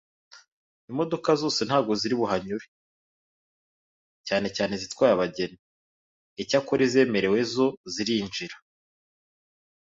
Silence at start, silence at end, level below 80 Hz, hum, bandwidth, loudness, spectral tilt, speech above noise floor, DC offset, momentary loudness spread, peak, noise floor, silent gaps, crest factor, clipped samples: 0.35 s; 1.35 s; -64 dBFS; none; 7.8 kHz; -26 LUFS; -4.5 dB/octave; over 65 dB; under 0.1%; 13 LU; -8 dBFS; under -90 dBFS; 0.52-0.88 s, 2.68-4.24 s, 5.59-6.36 s, 7.77-7.84 s; 20 dB; under 0.1%